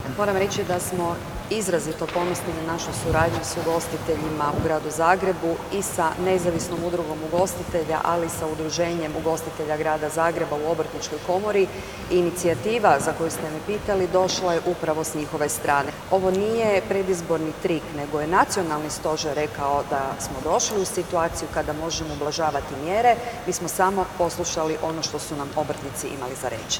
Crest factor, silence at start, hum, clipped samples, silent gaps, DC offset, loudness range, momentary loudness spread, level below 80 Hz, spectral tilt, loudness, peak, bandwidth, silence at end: 22 dB; 0 s; none; under 0.1%; none; under 0.1%; 2 LU; 7 LU; -46 dBFS; -4 dB/octave; -24 LUFS; -2 dBFS; over 20 kHz; 0 s